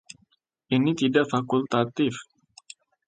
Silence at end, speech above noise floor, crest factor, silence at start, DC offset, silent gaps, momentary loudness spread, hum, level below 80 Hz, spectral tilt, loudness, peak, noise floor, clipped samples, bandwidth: 0.85 s; 44 dB; 20 dB; 0.7 s; under 0.1%; none; 18 LU; none; -68 dBFS; -6 dB/octave; -24 LUFS; -6 dBFS; -68 dBFS; under 0.1%; 9.2 kHz